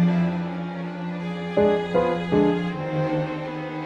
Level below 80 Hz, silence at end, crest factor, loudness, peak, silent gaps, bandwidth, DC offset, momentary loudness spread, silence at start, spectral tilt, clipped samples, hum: -52 dBFS; 0 s; 16 dB; -24 LUFS; -8 dBFS; none; 7 kHz; under 0.1%; 10 LU; 0 s; -8.5 dB/octave; under 0.1%; none